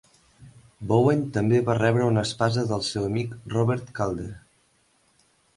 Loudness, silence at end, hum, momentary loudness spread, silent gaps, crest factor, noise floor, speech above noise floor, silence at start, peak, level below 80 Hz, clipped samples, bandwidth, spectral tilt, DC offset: -24 LUFS; 1.2 s; none; 8 LU; none; 18 dB; -65 dBFS; 41 dB; 0.4 s; -8 dBFS; -54 dBFS; under 0.1%; 11.5 kHz; -6.5 dB/octave; under 0.1%